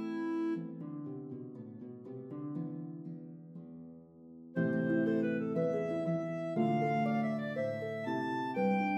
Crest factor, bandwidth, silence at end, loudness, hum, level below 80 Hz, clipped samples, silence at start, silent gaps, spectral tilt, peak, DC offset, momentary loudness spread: 16 dB; 8.4 kHz; 0 s; -35 LUFS; none; -80 dBFS; under 0.1%; 0 s; none; -8.5 dB/octave; -20 dBFS; under 0.1%; 18 LU